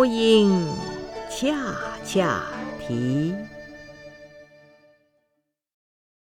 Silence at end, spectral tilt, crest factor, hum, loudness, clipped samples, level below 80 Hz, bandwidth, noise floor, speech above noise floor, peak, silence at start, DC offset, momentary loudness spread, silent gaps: 1.9 s; -5.5 dB/octave; 20 dB; none; -24 LUFS; under 0.1%; -52 dBFS; 15.5 kHz; -76 dBFS; 54 dB; -6 dBFS; 0 s; under 0.1%; 25 LU; none